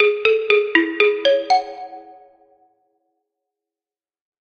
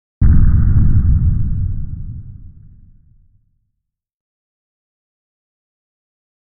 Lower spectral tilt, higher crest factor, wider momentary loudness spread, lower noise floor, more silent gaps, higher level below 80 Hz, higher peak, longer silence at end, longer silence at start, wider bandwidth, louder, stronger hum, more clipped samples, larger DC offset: second, -2.5 dB/octave vs -14.5 dB/octave; first, 20 dB vs 14 dB; about the same, 18 LU vs 18 LU; first, under -90 dBFS vs -74 dBFS; neither; second, -68 dBFS vs -18 dBFS; about the same, 0 dBFS vs -2 dBFS; second, 2.4 s vs 4.05 s; second, 0 s vs 0.2 s; first, 6.8 kHz vs 2 kHz; about the same, -17 LUFS vs -15 LUFS; neither; neither; neither